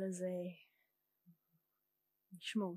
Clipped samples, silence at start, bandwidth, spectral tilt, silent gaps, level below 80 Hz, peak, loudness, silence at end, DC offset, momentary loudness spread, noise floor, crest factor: under 0.1%; 0 s; 15 kHz; -5.5 dB/octave; none; under -90 dBFS; -28 dBFS; -44 LUFS; 0 s; under 0.1%; 20 LU; -86 dBFS; 18 dB